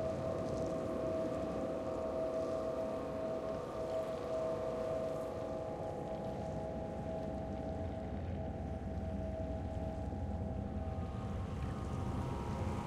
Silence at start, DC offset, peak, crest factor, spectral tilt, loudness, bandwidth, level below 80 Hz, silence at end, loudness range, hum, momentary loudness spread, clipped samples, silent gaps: 0 s; under 0.1%; -26 dBFS; 14 dB; -8 dB/octave; -40 LUFS; 13 kHz; -50 dBFS; 0 s; 3 LU; none; 4 LU; under 0.1%; none